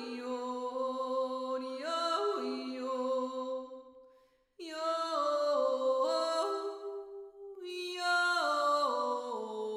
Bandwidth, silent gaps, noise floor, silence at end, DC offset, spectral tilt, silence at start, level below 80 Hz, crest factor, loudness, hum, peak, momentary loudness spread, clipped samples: 15.5 kHz; none; -67 dBFS; 0 s; under 0.1%; -1.5 dB/octave; 0 s; -82 dBFS; 14 dB; -34 LUFS; none; -20 dBFS; 14 LU; under 0.1%